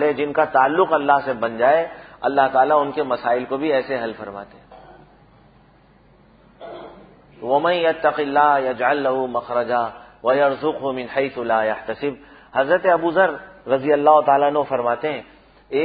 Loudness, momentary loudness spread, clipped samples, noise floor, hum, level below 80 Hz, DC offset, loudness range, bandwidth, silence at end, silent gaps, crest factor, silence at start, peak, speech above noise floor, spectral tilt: -19 LUFS; 12 LU; under 0.1%; -52 dBFS; none; -58 dBFS; under 0.1%; 9 LU; 5 kHz; 0 s; none; 18 dB; 0 s; -2 dBFS; 34 dB; -10 dB/octave